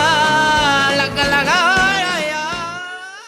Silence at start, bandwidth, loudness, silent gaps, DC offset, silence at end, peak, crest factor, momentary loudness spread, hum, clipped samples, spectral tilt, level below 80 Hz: 0 s; 18.5 kHz; -14 LUFS; none; under 0.1%; 0 s; -2 dBFS; 14 dB; 11 LU; none; under 0.1%; -2.5 dB/octave; -42 dBFS